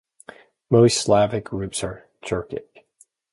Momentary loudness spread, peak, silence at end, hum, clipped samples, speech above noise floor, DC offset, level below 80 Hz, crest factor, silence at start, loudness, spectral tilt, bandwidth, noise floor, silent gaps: 18 LU; -4 dBFS; 0.7 s; none; under 0.1%; 39 dB; under 0.1%; -50 dBFS; 20 dB; 0.7 s; -21 LUFS; -5 dB/octave; 11.5 kHz; -59 dBFS; none